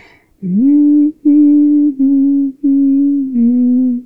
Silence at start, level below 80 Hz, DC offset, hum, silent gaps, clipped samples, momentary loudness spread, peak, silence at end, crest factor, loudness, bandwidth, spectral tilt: 0.4 s; -60 dBFS; under 0.1%; none; none; under 0.1%; 5 LU; -2 dBFS; 0.05 s; 8 dB; -11 LUFS; 2.4 kHz; -12 dB/octave